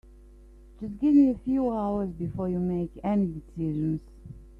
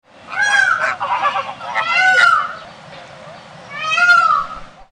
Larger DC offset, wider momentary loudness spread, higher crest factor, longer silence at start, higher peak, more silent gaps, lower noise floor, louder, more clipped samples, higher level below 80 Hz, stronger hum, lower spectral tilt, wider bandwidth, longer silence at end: neither; second, 16 LU vs 19 LU; about the same, 16 dB vs 14 dB; first, 0.4 s vs 0.25 s; second, -12 dBFS vs -2 dBFS; neither; first, -50 dBFS vs -37 dBFS; second, -27 LUFS vs -14 LUFS; neither; first, -48 dBFS vs -54 dBFS; neither; first, -10.5 dB/octave vs -0.5 dB/octave; second, 4.3 kHz vs 10.5 kHz; about the same, 0.1 s vs 0.2 s